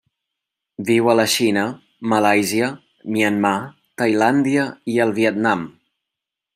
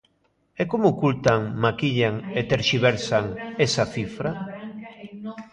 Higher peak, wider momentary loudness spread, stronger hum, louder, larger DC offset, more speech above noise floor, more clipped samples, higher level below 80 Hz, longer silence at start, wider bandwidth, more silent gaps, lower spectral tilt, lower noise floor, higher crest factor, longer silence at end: about the same, -2 dBFS vs 0 dBFS; second, 11 LU vs 16 LU; neither; first, -19 LUFS vs -23 LUFS; neither; first, 66 dB vs 45 dB; neither; second, -66 dBFS vs -52 dBFS; first, 0.8 s vs 0.6 s; first, 16 kHz vs 10 kHz; neither; about the same, -4.5 dB/octave vs -5.5 dB/octave; first, -84 dBFS vs -67 dBFS; second, 18 dB vs 24 dB; first, 0.85 s vs 0.05 s